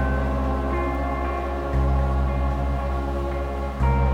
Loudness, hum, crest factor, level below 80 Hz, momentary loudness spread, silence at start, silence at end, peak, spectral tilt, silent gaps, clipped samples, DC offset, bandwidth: -25 LUFS; none; 14 dB; -24 dBFS; 5 LU; 0 s; 0 s; -10 dBFS; -8.5 dB/octave; none; under 0.1%; under 0.1%; 6.8 kHz